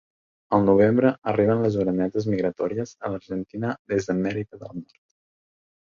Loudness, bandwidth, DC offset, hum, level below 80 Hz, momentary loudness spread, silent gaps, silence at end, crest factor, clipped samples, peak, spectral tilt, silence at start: -23 LUFS; 7.4 kHz; under 0.1%; none; -54 dBFS; 14 LU; 3.79-3.85 s; 1.05 s; 18 dB; under 0.1%; -6 dBFS; -8 dB/octave; 0.5 s